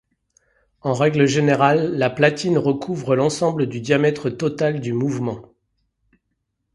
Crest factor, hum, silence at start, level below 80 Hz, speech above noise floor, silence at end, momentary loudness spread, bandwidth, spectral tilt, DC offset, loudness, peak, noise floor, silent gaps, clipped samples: 20 dB; none; 0.85 s; -58 dBFS; 56 dB; 1.35 s; 8 LU; 11.5 kHz; -6 dB/octave; under 0.1%; -19 LUFS; 0 dBFS; -74 dBFS; none; under 0.1%